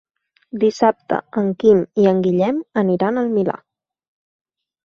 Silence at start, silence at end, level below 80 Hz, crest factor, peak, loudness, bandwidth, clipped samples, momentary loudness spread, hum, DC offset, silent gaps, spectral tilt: 0.55 s; 1.3 s; -60 dBFS; 16 dB; -2 dBFS; -18 LUFS; 7.2 kHz; under 0.1%; 9 LU; none; under 0.1%; none; -8 dB/octave